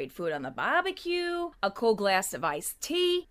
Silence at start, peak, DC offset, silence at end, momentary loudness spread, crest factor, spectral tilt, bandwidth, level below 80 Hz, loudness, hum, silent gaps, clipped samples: 0 s; -12 dBFS; under 0.1%; 0.05 s; 7 LU; 16 dB; -3 dB/octave; 16 kHz; -62 dBFS; -29 LUFS; none; none; under 0.1%